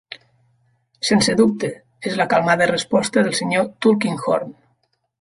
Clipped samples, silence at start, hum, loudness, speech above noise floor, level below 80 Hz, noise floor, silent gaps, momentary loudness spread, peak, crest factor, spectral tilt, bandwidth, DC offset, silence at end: under 0.1%; 0.1 s; none; -19 LUFS; 50 dB; -58 dBFS; -68 dBFS; none; 12 LU; -2 dBFS; 18 dB; -4.5 dB/octave; 11.5 kHz; under 0.1%; 0.7 s